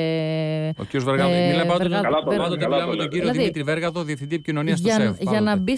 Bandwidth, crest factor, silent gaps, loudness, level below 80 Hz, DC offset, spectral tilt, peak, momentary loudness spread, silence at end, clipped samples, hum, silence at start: 11 kHz; 12 dB; none; -22 LUFS; -54 dBFS; under 0.1%; -6 dB/octave; -10 dBFS; 7 LU; 0 s; under 0.1%; none; 0 s